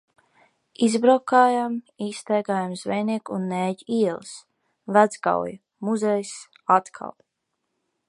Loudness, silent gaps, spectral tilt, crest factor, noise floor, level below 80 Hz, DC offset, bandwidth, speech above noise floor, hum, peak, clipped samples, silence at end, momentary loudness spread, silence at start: -23 LUFS; none; -5.5 dB/octave; 22 dB; -78 dBFS; -72 dBFS; under 0.1%; 11.5 kHz; 56 dB; none; -2 dBFS; under 0.1%; 0.95 s; 18 LU; 0.8 s